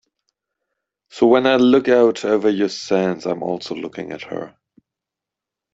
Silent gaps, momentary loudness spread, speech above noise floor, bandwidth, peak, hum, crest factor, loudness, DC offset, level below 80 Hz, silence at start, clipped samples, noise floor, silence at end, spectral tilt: none; 16 LU; 68 dB; 7.8 kHz; -2 dBFS; none; 16 dB; -17 LUFS; under 0.1%; -62 dBFS; 1.15 s; under 0.1%; -86 dBFS; 1.25 s; -5.5 dB/octave